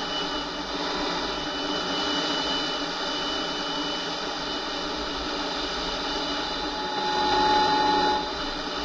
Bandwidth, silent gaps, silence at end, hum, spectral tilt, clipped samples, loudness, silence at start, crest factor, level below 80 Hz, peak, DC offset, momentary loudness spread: 9 kHz; none; 0 s; none; -3 dB/octave; under 0.1%; -26 LUFS; 0 s; 18 dB; -46 dBFS; -10 dBFS; under 0.1%; 8 LU